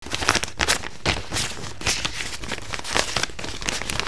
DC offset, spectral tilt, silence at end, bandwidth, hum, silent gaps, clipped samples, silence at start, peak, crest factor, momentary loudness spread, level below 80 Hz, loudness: 2%; -2 dB/octave; 0 s; 11 kHz; none; none; under 0.1%; 0 s; 0 dBFS; 26 dB; 8 LU; -40 dBFS; -24 LUFS